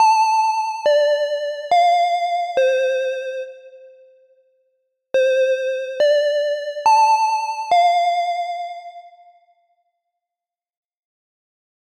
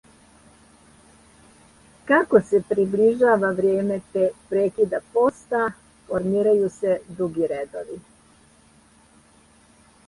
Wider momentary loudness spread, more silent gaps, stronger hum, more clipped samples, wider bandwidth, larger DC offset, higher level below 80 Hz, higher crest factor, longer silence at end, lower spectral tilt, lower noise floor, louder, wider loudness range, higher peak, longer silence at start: about the same, 12 LU vs 11 LU; neither; neither; neither; first, 14 kHz vs 11.5 kHz; neither; second, -74 dBFS vs -60 dBFS; second, 14 dB vs 20 dB; first, 2.9 s vs 2.1 s; second, 0.5 dB/octave vs -7 dB/octave; first, -88 dBFS vs -55 dBFS; first, -18 LUFS vs -22 LUFS; about the same, 6 LU vs 5 LU; second, -6 dBFS vs -2 dBFS; second, 0 s vs 2.05 s